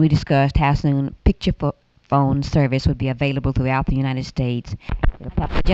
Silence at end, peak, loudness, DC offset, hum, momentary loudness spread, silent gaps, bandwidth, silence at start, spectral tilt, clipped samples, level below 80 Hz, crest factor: 0 s; -4 dBFS; -21 LUFS; under 0.1%; none; 8 LU; none; 7.8 kHz; 0 s; -8 dB/octave; under 0.1%; -28 dBFS; 16 dB